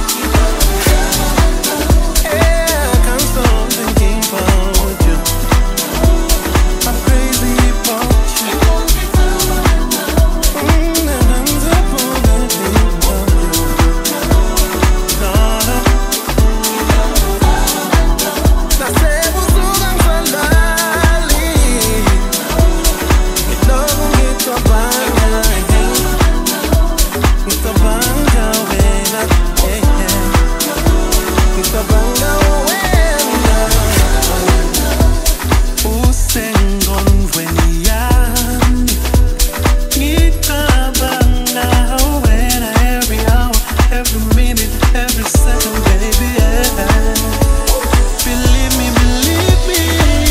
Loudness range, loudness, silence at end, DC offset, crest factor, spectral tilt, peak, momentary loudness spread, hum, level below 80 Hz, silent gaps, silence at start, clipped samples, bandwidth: 1 LU; -13 LUFS; 0 s; under 0.1%; 10 dB; -4 dB/octave; 0 dBFS; 2 LU; none; -14 dBFS; none; 0 s; under 0.1%; 16.5 kHz